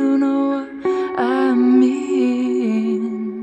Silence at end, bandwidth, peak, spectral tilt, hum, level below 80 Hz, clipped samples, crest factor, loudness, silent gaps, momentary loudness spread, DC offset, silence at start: 0 s; 8.2 kHz; -4 dBFS; -6.5 dB/octave; none; -62 dBFS; under 0.1%; 12 dB; -18 LUFS; none; 8 LU; under 0.1%; 0 s